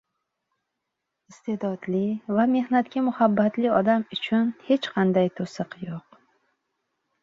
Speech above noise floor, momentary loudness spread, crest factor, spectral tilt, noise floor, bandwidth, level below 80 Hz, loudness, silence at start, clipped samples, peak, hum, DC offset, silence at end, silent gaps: 58 dB; 12 LU; 20 dB; -7.5 dB/octave; -82 dBFS; 7.6 kHz; -68 dBFS; -24 LUFS; 1.3 s; under 0.1%; -6 dBFS; none; under 0.1%; 1.25 s; none